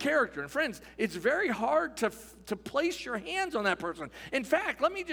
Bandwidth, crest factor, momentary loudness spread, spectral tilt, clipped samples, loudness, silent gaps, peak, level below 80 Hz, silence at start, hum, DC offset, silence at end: over 20 kHz; 18 dB; 8 LU; -4 dB/octave; under 0.1%; -31 LUFS; none; -12 dBFS; -62 dBFS; 0 s; none; under 0.1%; 0 s